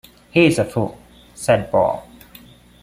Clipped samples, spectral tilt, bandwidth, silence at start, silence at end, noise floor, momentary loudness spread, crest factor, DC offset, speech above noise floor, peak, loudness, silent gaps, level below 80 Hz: under 0.1%; -6 dB/octave; 16 kHz; 0.35 s; 0.8 s; -45 dBFS; 11 LU; 18 dB; under 0.1%; 28 dB; -2 dBFS; -18 LUFS; none; -50 dBFS